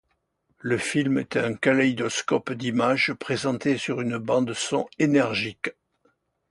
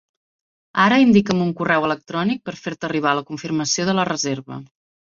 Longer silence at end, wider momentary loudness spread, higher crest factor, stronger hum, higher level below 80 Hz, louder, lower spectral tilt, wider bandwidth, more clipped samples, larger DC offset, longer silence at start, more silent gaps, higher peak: first, 0.8 s vs 0.4 s; second, 6 LU vs 14 LU; about the same, 18 dB vs 18 dB; neither; second, -64 dBFS vs -58 dBFS; second, -24 LUFS vs -19 LUFS; about the same, -4.5 dB/octave vs -4.5 dB/octave; first, 11.5 kHz vs 7.6 kHz; neither; neither; about the same, 0.65 s vs 0.75 s; neither; second, -6 dBFS vs -2 dBFS